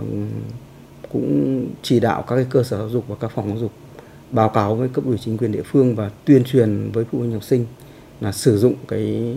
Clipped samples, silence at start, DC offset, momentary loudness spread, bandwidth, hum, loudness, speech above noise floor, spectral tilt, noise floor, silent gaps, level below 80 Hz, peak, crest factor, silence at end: under 0.1%; 0 s; under 0.1%; 11 LU; 16 kHz; none; -20 LUFS; 21 dB; -7.5 dB/octave; -40 dBFS; none; -52 dBFS; 0 dBFS; 20 dB; 0 s